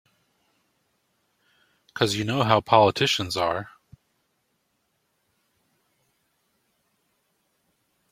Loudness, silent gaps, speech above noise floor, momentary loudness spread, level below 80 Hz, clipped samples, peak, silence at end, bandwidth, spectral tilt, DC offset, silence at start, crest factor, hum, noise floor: -22 LUFS; none; 51 dB; 15 LU; -64 dBFS; under 0.1%; -2 dBFS; 4.45 s; 16.5 kHz; -4.5 dB/octave; under 0.1%; 1.95 s; 26 dB; none; -73 dBFS